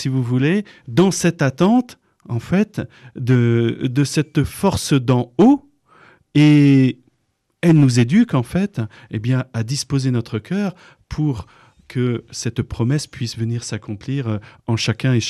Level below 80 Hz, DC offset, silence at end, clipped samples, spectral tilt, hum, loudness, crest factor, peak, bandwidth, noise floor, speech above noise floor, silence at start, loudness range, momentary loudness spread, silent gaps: -46 dBFS; under 0.1%; 0 s; under 0.1%; -6.5 dB/octave; none; -18 LUFS; 12 dB; -6 dBFS; 13 kHz; -68 dBFS; 51 dB; 0 s; 8 LU; 14 LU; none